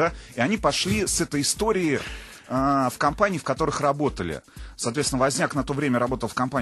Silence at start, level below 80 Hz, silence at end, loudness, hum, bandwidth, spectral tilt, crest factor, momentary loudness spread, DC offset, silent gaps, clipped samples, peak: 0 s; -42 dBFS; 0 s; -24 LUFS; none; 12.5 kHz; -4 dB/octave; 20 dB; 8 LU; under 0.1%; none; under 0.1%; -4 dBFS